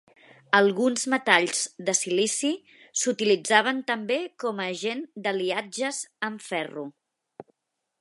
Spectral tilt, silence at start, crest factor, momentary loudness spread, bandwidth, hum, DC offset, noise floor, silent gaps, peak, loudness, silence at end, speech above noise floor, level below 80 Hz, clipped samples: -2 dB/octave; 0.5 s; 26 dB; 11 LU; 11.5 kHz; none; under 0.1%; -79 dBFS; none; -2 dBFS; -25 LUFS; 0.6 s; 53 dB; -82 dBFS; under 0.1%